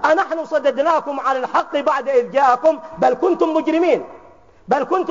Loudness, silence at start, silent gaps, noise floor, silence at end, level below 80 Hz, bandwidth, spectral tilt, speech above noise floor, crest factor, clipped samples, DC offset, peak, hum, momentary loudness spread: -18 LUFS; 0 s; none; -47 dBFS; 0 s; -60 dBFS; 7.6 kHz; -3 dB/octave; 29 dB; 14 dB; under 0.1%; 0.2%; -4 dBFS; none; 5 LU